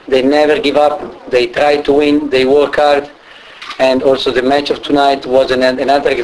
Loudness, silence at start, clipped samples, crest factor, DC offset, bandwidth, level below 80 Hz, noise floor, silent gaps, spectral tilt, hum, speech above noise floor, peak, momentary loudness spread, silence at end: -12 LUFS; 0.05 s; under 0.1%; 12 dB; under 0.1%; 11 kHz; -42 dBFS; -34 dBFS; none; -4.5 dB/octave; none; 23 dB; 0 dBFS; 5 LU; 0 s